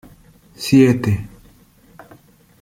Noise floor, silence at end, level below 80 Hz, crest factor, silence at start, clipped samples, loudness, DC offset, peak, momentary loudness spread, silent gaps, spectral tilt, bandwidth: -50 dBFS; 1.35 s; -50 dBFS; 18 dB; 0.6 s; under 0.1%; -16 LUFS; under 0.1%; -2 dBFS; 16 LU; none; -6.5 dB/octave; 16 kHz